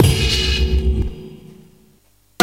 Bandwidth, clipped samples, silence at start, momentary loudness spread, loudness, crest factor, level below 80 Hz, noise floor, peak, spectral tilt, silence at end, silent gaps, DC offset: 16 kHz; under 0.1%; 0 s; 19 LU; -18 LUFS; 18 dB; -22 dBFS; -56 dBFS; 0 dBFS; -4.5 dB/octave; 0 s; none; under 0.1%